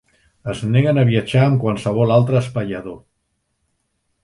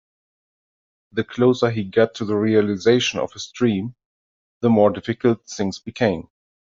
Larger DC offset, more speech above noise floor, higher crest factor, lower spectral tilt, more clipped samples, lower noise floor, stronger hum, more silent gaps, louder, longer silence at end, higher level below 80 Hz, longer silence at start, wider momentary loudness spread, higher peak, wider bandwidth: neither; second, 54 dB vs over 70 dB; about the same, 18 dB vs 18 dB; first, -8 dB/octave vs -6 dB/octave; neither; second, -70 dBFS vs under -90 dBFS; neither; second, none vs 4.05-4.61 s; first, -17 LUFS vs -20 LUFS; first, 1.25 s vs 0.6 s; first, -50 dBFS vs -58 dBFS; second, 0.45 s vs 1.15 s; first, 14 LU vs 10 LU; about the same, -2 dBFS vs -4 dBFS; first, 11 kHz vs 7.6 kHz